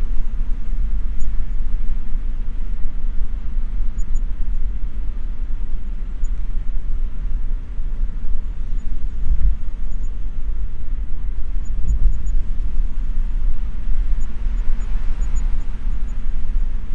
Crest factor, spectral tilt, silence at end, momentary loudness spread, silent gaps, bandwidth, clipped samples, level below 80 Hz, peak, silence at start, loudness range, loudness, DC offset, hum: 12 dB; -7 dB/octave; 0 s; 5 LU; none; 2.1 kHz; under 0.1%; -18 dBFS; -2 dBFS; 0 s; 3 LU; -28 LUFS; under 0.1%; none